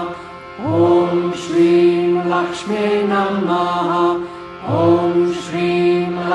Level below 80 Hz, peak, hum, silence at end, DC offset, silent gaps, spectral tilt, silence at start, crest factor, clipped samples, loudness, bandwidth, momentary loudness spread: -56 dBFS; -2 dBFS; none; 0 s; under 0.1%; none; -7 dB/octave; 0 s; 14 dB; under 0.1%; -16 LUFS; 9.6 kHz; 11 LU